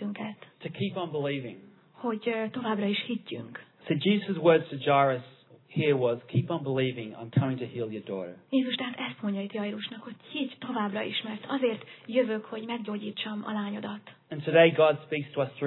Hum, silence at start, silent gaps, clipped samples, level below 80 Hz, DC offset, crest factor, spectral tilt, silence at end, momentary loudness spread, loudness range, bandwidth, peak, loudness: none; 0 s; none; under 0.1%; -80 dBFS; under 0.1%; 22 dB; -10 dB/octave; 0 s; 15 LU; 6 LU; 4.2 kHz; -8 dBFS; -29 LUFS